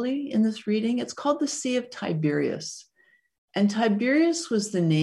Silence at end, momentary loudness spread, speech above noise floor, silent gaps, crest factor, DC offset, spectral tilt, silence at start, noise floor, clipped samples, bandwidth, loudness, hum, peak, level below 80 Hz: 0 s; 8 LU; 40 dB; 3.38-3.48 s; 14 dB; under 0.1%; -5.5 dB/octave; 0 s; -64 dBFS; under 0.1%; 12 kHz; -25 LUFS; none; -10 dBFS; -72 dBFS